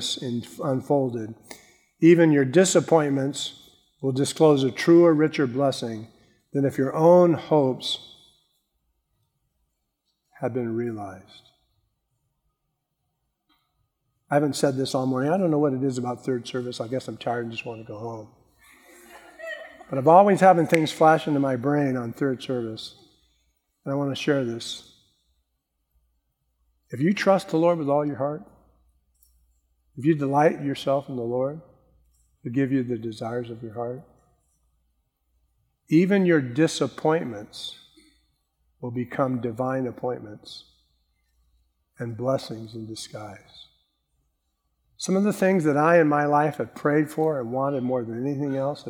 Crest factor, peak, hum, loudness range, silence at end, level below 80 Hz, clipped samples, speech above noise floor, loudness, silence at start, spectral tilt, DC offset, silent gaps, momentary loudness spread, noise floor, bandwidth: 22 dB; -4 dBFS; none; 14 LU; 0 s; -68 dBFS; under 0.1%; 55 dB; -23 LUFS; 0 s; -6 dB/octave; under 0.1%; none; 19 LU; -78 dBFS; 16 kHz